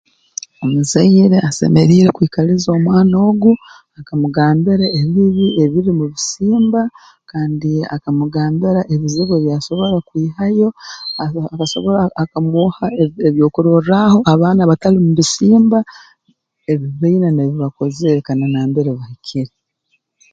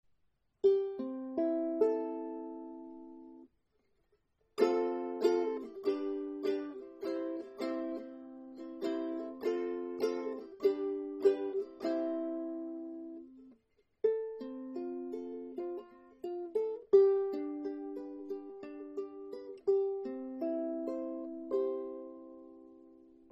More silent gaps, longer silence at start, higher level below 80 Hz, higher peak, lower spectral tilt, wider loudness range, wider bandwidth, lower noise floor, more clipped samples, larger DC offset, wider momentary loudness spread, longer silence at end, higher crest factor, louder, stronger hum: neither; about the same, 0.6 s vs 0.65 s; first, -48 dBFS vs -78 dBFS; first, 0 dBFS vs -14 dBFS; about the same, -6.5 dB/octave vs -5.5 dB/octave; about the same, 5 LU vs 6 LU; first, 9 kHz vs 8 kHz; second, -65 dBFS vs -78 dBFS; neither; neither; second, 11 LU vs 16 LU; first, 0.85 s vs 0.35 s; second, 14 dB vs 22 dB; first, -14 LUFS vs -36 LUFS; neither